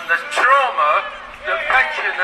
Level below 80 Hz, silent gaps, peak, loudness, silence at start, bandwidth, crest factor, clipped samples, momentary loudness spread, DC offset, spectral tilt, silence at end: -52 dBFS; none; -2 dBFS; -16 LUFS; 0 s; 13.5 kHz; 14 dB; under 0.1%; 11 LU; under 0.1%; -1 dB/octave; 0 s